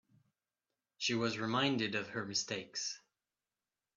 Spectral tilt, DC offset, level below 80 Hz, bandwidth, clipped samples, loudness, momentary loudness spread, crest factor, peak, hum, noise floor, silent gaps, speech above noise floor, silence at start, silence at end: -3.5 dB/octave; under 0.1%; -80 dBFS; 8.4 kHz; under 0.1%; -36 LUFS; 7 LU; 22 dB; -18 dBFS; none; under -90 dBFS; none; over 53 dB; 1 s; 1 s